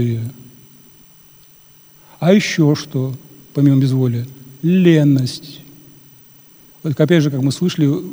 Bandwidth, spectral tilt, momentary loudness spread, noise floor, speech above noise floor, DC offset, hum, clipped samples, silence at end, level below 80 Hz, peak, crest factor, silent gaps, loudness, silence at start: over 20 kHz; -7 dB/octave; 17 LU; -46 dBFS; 32 dB; under 0.1%; none; under 0.1%; 0 s; -60 dBFS; 0 dBFS; 16 dB; none; -16 LUFS; 0 s